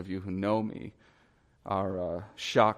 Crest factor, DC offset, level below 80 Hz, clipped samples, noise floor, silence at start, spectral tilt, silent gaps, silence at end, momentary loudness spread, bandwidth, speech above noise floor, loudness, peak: 22 dB; under 0.1%; -64 dBFS; under 0.1%; -65 dBFS; 0 s; -6 dB/octave; none; 0 s; 15 LU; 15 kHz; 35 dB; -32 LUFS; -10 dBFS